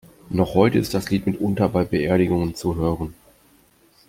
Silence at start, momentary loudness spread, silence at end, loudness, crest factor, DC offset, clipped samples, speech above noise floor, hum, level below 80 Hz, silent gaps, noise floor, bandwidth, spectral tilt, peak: 0.3 s; 7 LU; 0.95 s; -21 LUFS; 20 dB; under 0.1%; under 0.1%; 36 dB; none; -44 dBFS; none; -56 dBFS; 16.5 kHz; -7 dB/octave; -2 dBFS